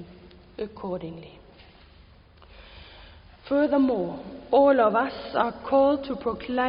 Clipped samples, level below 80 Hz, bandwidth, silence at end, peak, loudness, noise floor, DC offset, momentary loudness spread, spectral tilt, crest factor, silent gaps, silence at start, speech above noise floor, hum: under 0.1%; -54 dBFS; 5.4 kHz; 0 s; -8 dBFS; -24 LUFS; -53 dBFS; under 0.1%; 20 LU; -10 dB/octave; 18 dB; none; 0 s; 29 dB; none